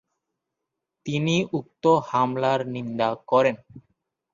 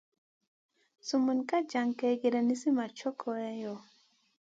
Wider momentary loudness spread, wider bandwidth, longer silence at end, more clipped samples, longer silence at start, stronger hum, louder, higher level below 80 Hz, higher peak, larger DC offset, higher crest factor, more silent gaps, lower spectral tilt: about the same, 9 LU vs 11 LU; about the same, 7.4 kHz vs 7.8 kHz; second, 0.55 s vs 0.7 s; neither; about the same, 1.05 s vs 1.05 s; neither; first, -24 LUFS vs -32 LUFS; first, -64 dBFS vs -86 dBFS; first, -6 dBFS vs -18 dBFS; neither; about the same, 18 dB vs 16 dB; neither; first, -6 dB/octave vs -4.5 dB/octave